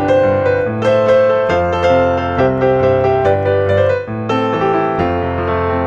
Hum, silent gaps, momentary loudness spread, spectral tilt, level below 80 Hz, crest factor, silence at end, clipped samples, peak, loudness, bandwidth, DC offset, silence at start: none; none; 5 LU; -7.5 dB/octave; -38 dBFS; 12 dB; 0 s; under 0.1%; -2 dBFS; -14 LUFS; 7.4 kHz; under 0.1%; 0 s